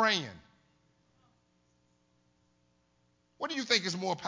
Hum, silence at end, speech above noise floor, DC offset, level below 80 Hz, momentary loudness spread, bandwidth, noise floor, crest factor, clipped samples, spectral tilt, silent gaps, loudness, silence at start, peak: 60 Hz at -75 dBFS; 0 s; 40 dB; under 0.1%; -74 dBFS; 13 LU; 7.6 kHz; -72 dBFS; 26 dB; under 0.1%; -2.5 dB/octave; none; -31 LUFS; 0 s; -10 dBFS